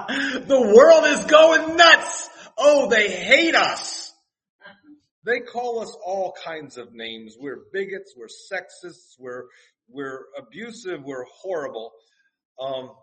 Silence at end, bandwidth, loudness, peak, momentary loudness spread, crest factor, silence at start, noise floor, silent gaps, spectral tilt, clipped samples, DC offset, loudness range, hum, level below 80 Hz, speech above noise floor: 0.15 s; 8.8 kHz; -17 LUFS; 0 dBFS; 24 LU; 20 dB; 0 s; -49 dBFS; 4.50-4.59 s, 5.11-5.22 s, 12.45-12.55 s; -2 dB/octave; under 0.1%; under 0.1%; 20 LU; none; -64 dBFS; 29 dB